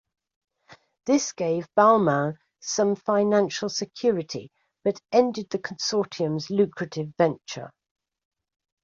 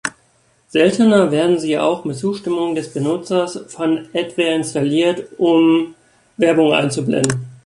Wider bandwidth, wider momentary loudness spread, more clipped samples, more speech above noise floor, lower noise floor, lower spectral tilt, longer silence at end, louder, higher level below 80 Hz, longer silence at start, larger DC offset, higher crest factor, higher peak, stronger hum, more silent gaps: second, 7.6 kHz vs 11.5 kHz; first, 15 LU vs 9 LU; neither; second, 31 dB vs 41 dB; about the same, -55 dBFS vs -57 dBFS; about the same, -5 dB/octave vs -5.5 dB/octave; first, 1.15 s vs 0.1 s; second, -24 LUFS vs -17 LUFS; second, -70 dBFS vs -58 dBFS; first, 0.7 s vs 0.05 s; neither; about the same, 20 dB vs 16 dB; second, -4 dBFS vs 0 dBFS; neither; neither